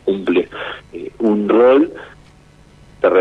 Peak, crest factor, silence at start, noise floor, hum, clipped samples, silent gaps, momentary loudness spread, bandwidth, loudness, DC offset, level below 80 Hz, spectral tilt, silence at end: 0 dBFS; 16 dB; 0.05 s; -46 dBFS; none; under 0.1%; none; 19 LU; 6.4 kHz; -15 LUFS; under 0.1%; -50 dBFS; -7.5 dB/octave; 0 s